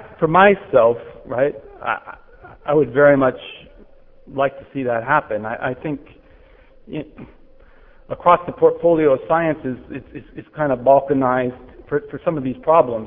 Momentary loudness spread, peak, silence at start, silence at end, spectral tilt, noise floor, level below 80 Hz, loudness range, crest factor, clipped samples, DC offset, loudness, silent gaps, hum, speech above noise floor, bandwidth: 19 LU; 0 dBFS; 0 s; 0 s; -11 dB/octave; -48 dBFS; -50 dBFS; 6 LU; 18 dB; under 0.1%; under 0.1%; -18 LUFS; none; none; 30 dB; 3.8 kHz